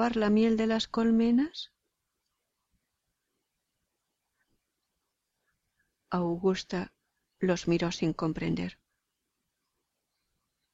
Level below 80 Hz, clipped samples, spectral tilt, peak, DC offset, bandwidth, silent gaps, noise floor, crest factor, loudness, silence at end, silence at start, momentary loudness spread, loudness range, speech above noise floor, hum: -60 dBFS; under 0.1%; -6 dB/octave; -16 dBFS; under 0.1%; 7.8 kHz; none; -83 dBFS; 16 dB; -29 LUFS; 2 s; 0 s; 11 LU; 7 LU; 55 dB; none